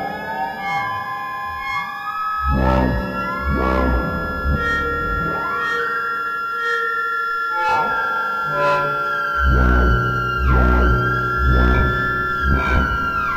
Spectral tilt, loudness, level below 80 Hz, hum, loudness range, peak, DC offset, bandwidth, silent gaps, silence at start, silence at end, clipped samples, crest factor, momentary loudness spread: -7 dB/octave; -19 LUFS; -24 dBFS; none; 4 LU; -4 dBFS; under 0.1%; 12.5 kHz; none; 0 s; 0 s; under 0.1%; 16 dB; 8 LU